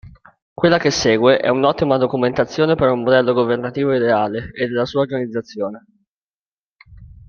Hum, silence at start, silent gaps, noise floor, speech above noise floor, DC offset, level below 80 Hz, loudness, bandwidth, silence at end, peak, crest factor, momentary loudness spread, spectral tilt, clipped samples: none; 0.05 s; 0.42-0.56 s, 6.08-6.79 s; under -90 dBFS; over 73 dB; under 0.1%; -50 dBFS; -17 LUFS; 7.2 kHz; 0.2 s; -2 dBFS; 16 dB; 9 LU; -5.5 dB/octave; under 0.1%